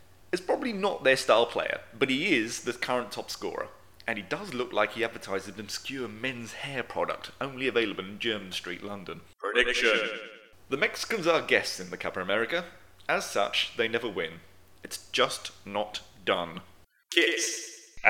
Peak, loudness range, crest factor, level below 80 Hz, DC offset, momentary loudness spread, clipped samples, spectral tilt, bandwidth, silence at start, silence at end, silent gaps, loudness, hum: -4 dBFS; 5 LU; 26 dB; -62 dBFS; 0.2%; 13 LU; under 0.1%; -2.5 dB/octave; 17.5 kHz; 0.35 s; 0 s; none; -29 LUFS; none